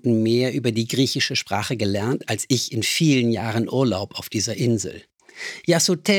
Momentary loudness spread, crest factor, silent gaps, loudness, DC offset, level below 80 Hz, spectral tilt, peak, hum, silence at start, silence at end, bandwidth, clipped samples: 8 LU; 18 dB; none; -21 LUFS; under 0.1%; -62 dBFS; -4.5 dB/octave; -4 dBFS; none; 0.05 s; 0 s; 19.5 kHz; under 0.1%